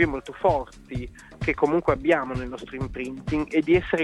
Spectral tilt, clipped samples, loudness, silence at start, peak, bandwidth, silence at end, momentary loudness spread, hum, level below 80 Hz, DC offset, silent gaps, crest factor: -7 dB/octave; under 0.1%; -25 LUFS; 0 s; -6 dBFS; 11.5 kHz; 0 s; 13 LU; none; -42 dBFS; under 0.1%; none; 18 dB